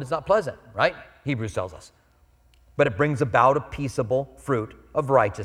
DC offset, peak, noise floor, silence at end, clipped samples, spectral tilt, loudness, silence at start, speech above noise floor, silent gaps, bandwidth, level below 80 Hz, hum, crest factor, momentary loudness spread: under 0.1%; -4 dBFS; -59 dBFS; 0 s; under 0.1%; -6.5 dB/octave; -24 LUFS; 0 s; 35 dB; none; 13 kHz; -52 dBFS; none; 20 dB; 12 LU